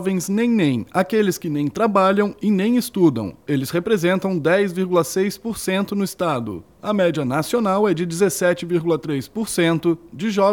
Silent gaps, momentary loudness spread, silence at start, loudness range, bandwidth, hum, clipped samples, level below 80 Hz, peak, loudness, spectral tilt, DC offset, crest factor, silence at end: none; 6 LU; 0 s; 2 LU; 19 kHz; none; under 0.1%; -56 dBFS; -4 dBFS; -20 LUFS; -5.5 dB/octave; under 0.1%; 16 dB; 0 s